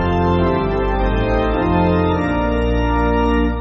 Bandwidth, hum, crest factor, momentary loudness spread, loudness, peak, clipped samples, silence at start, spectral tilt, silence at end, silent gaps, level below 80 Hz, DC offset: 6.6 kHz; none; 12 dB; 3 LU; -17 LUFS; -4 dBFS; under 0.1%; 0 s; -6.5 dB/octave; 0 s; none; -22 dBFS; under 0.1%